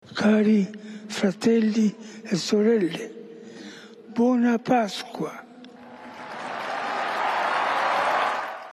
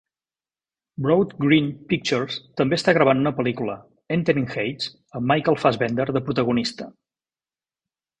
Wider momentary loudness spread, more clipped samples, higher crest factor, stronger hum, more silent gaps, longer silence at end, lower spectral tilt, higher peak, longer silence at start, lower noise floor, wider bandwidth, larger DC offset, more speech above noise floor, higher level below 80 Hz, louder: first, 21 LU vs 11 LU; neither; about the same, 16 dB vs 20 dB; neither; neither; second, 0 s vs 1.3 s; about the same, -5.5 dB/octave vs -6 dB/octave; second, -10 dBFS vs -2 dBFS; second, 0.05 s vs 1 s; second, -45 dBFS vs under -90 dBFS; first, 12.5 kHz vs 10.5 kHz; neither; second, 23 dB vs over 68 dB; second, -72 dBFS vs -58 dBFS; about the same, -24 LUFS vs -22 LUFS